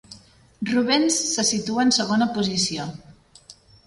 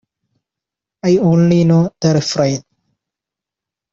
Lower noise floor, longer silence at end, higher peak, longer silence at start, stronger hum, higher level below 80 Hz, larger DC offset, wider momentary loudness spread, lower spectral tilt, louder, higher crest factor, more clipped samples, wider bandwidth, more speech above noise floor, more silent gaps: second, -50 dBFS vs -86 dBFS; second, 0.35 s vs 1.35 s; second, -8 dBFS vs -2 dBFS; second, 0.1 s vs 1.05 s; neither; second, -58 dBFS vs -52 dBFS; neither; about the same, 9 LU vs 8 LU; second, -3 dB/octave vs -6.5 dB/octave; second, -21 LUFS vs -14 LUFS; about the same, 16 dB vs 14 dB; neither; first, 11.5 kHz vs 7.6 kHz; second, 28 dB vs 73 dB; neither